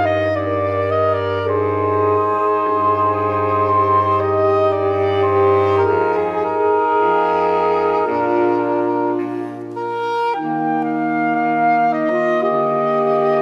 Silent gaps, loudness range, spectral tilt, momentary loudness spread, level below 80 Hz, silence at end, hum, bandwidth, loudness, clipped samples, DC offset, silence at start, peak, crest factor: none; 3 LU; -8 dB/octave; 5 LU; -62 dBFS; 0 s; none; 6.6 kHz; -17 LUFS; under 0.1%; under 0.1%; 0 s; -4 dBFS; 12 dB